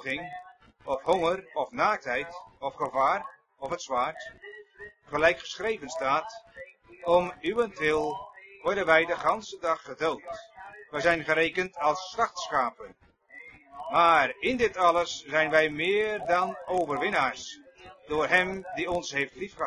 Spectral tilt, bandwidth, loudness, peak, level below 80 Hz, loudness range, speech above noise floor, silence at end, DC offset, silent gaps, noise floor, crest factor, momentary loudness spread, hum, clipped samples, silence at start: -4 dB/octave; 11 kHz; -27 LUFS; -6 dBFS; -60 dBFS; 5 LU; 23 dB; 0 s; under 0.1%; none; -50 dBFS; 22 dB; 21 LU; none; under 0.1%; 0 s